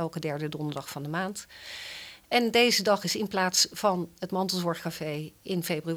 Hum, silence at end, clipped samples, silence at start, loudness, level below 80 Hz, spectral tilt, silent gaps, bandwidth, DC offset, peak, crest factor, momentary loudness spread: none; 0 s; under 0.1%; 0 s; -28 LUFS; -66 dBFS; -3.5 dB/octave; none; over 20 kHz; under 0.1%; -8 dBFS; 20 dB; 16 LU